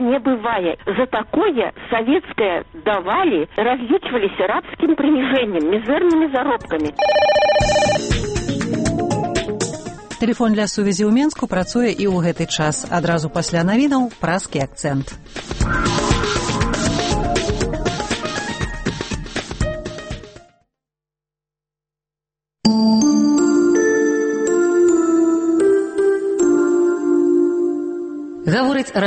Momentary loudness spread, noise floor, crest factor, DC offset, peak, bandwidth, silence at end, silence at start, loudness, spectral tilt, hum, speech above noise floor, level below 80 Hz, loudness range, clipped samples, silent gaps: 9 LU; -88 dBFS; 16 dB; under 0.1%; -2 dBFS; 8.8 kHz; 0 s; 0 s; -18 LUFS; -5 dB/octave; none; 70 dB; -34 dBFS; 7 LU; under 0.1%; none